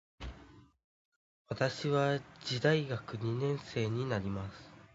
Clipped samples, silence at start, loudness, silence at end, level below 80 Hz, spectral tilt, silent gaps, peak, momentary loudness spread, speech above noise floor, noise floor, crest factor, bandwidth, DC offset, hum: under 0.1%; 0.2 s; -34 LUFS; 0.1 s; -58 dBFS; -5 dB/octave; 0.84-1.45 s; -16 dBFS; 17 LU; 24 dB; -58 dBFS; 20 dB; 7.6 kHz; under 0.1%; none